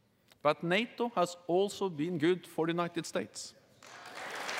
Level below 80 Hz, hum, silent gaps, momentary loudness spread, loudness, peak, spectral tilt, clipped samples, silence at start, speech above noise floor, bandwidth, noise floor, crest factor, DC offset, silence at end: -84 dBFS; none; none; 14 LU; -33 LUFS; -14 dBFS; -5 dB/octave; under 0.1%; 0.45 s; 20 dB; 16 kHz; -53 dBFS; 20 dB; under 0.1%; 0 s